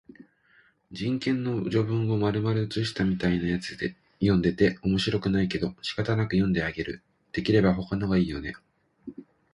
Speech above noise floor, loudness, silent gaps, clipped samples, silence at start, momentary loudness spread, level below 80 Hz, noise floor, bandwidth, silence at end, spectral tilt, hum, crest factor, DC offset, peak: 37 dB; -27 LUFS; none; under 0.1%; 0.9 s; 12 LU; -48 dBFS; -62 dBFS; 11 kHz; 0.3 s; -7 dB/octave; none; 18 dB; under 0.1%; -8 dBFS